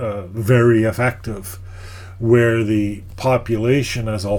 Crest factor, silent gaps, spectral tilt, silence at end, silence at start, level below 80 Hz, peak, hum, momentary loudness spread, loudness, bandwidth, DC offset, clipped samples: 16 dB; none; -7 dB/octave; 0 s; 0 s; -40 dBFS; -2 dBFS; none; 19 LU; -17 LUFS; 18.5 kHz; under 0.1%; under 0.1%